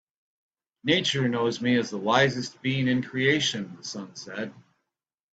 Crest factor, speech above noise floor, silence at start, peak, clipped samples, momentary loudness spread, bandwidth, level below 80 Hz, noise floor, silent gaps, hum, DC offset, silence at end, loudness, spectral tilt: 22 dB; 61 dB; 0.85 s; -4 dBFS; under 0.1%; 14 LU; 9 kHz; -66 dBFS; -87 dBFS; none; none; under 0.1%; 0.7 s; -25 LUFS; -4.5 dB/octave